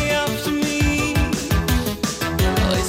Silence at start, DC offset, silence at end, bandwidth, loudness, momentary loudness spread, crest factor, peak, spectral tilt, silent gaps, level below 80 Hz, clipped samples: 0 s; under 0.1%; 0 s; 17 kHz; -20 LUFS; 3 LU; 12 dB; -8 dBFS; -4.5 dB/octave; none; -28 dBFS; under 0.1%